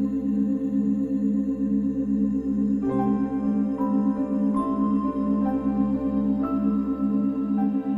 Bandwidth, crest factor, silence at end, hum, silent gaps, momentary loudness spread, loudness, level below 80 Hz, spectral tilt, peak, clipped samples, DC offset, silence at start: 3.3 kHz; 12 dB; 0 s; none; none; 1 LU; -24 LUFS; -48 dBFS; -10.5 dB/octave; -12 dBFS; under 0.1%; under 0.1%; 0 s